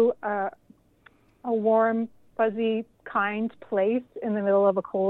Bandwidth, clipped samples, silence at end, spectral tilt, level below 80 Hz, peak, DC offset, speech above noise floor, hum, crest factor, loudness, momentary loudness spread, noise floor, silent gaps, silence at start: 4.1 kHz; under 0.1%; 0 s; -9 dB/octave; -70 dBFS; -10 dBFS; under 0.1%; 34 dB; none; 16 dB; -26 LUFS; 10 LU; -59 dBFS; none; 0 s